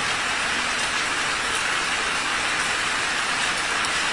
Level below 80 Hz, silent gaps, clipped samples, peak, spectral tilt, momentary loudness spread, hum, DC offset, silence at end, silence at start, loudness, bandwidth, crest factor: -50 dBFS; none; under 0.1%; -10 dBFS; -0.5 dB/octave; 1 LU; none; 0.2%; 0 s; 0 s; -22 LUFS; 11.5 kHz; 14 dB